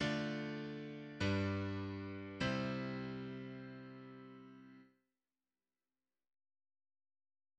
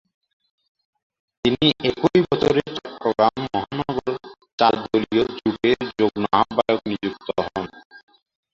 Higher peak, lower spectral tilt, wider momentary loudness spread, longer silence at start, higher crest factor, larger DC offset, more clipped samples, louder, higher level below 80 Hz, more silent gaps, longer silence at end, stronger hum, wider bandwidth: second, -24 dBFS vs -2 dBFS; about the same, -6.5 dB/octave vs -6.5 dB/octave; first, 18 LU vs 10 LU; second, 0 s vs 1.45 s; about the same, 20 dB vs 22 dB; neither; neither; second, -42 LUFS vs -21 LUFS; second, -70 dBFS vs -52 dBFS; second, none vs 4.53-4.58 s, 7.85-7.90 s; first, 2.75 s vs 0.55 s; neither; first, 9.2 kHz vs 7.6 kHz